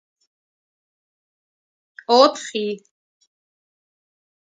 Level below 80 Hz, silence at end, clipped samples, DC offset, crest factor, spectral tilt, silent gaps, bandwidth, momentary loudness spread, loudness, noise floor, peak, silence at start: -82 dBFS; 1.8 s; under 0.1%; under 0.1%; 24 dB; -3 dB/octave; none; 9.4 kHz; 20 LU; -18 LUFS; under -90 dBFS; 0 dBFS; 2.1 s